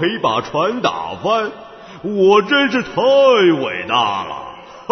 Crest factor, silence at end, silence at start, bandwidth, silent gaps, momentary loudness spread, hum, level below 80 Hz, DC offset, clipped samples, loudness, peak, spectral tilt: 16 dB; 0.1 s; 0 s; 6.4 kHz; none; 17 LU; none; -56 dBFS; under 0.1%; under 0.1%; -15 LUFS; 0 dBFS; -5 dB/octave